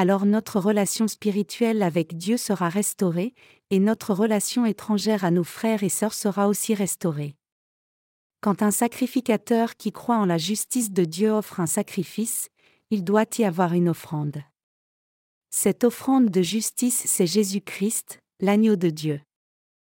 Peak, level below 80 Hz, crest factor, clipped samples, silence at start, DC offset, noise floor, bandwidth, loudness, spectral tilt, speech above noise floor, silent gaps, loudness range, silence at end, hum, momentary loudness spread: -8 dBFS; -72 dBFS; 16 dB; under 0.1%; 0 s; under 0.1%; under -90 dBFS; 17 kHz; -23 LUFS; -5 dB/octave; over 67 dB; 7.52-8.30 s, 14.63-15.41 s; 3 LU; 0.7 s; none; 8 LU